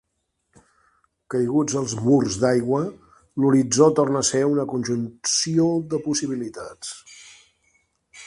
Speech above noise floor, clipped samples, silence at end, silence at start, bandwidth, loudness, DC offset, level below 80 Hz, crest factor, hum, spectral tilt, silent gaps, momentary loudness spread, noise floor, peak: 54 dB; under 0.1%; 0 s; 1.3 s; 11.5 kHz; -21 LUFS; under 0.1%; -58 dBFS; 20 dB; none; -5 dB/octave; none; 16 LU; -75 dBFS; -2 dBFS